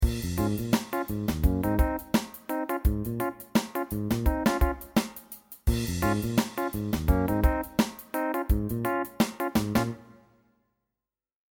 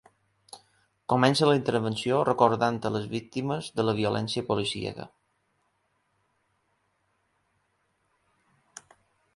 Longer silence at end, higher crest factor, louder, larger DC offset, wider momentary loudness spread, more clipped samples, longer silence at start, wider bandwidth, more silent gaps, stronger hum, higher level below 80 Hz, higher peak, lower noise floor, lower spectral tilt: second, 1.5 s vs 4.3 s; second, 18 dB vs 24 dB; about the same, -28 LUFS vs -26 LUFS; neither; second, 6 LU vs 11 LU; neither; second, 0 s vs 0.55 s; first, 20 kHz vs 11.5 kHz; neither; neither; first, -34 dBFS vs -64 dBFS; second, -10 dBFS vs -6 dBFS; first, under -90 dBFS vs -73 dBFS; about the same, -6 dB/octave vs -5.5 dB/octave